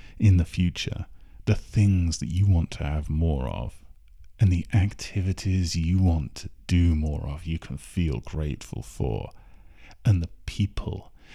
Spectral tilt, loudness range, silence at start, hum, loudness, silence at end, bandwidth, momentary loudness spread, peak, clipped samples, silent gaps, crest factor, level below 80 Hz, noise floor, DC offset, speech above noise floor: -6.5 dB/octave; 5 LU; 0.05 s; none; -26 LUFS; 0 s; 11.5 kHz; 13 LU; -10 dBFS; under 0.1%; none; 16 dB; -34 dBFS; -47 dBFS; under 0.1%; 23 dB